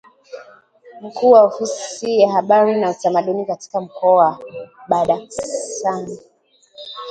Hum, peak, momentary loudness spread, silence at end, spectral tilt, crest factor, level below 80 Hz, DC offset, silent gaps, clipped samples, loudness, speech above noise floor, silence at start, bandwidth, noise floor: none; 0 dBFS; 24 LU; 0 s; -4.5 dB/octave; 18 dB; -62 dBFS; under 0.1%; none; under 0.1%; -17 LUFS; 38 dB; 0.3 s; 9.2 kHz; -54 dBFS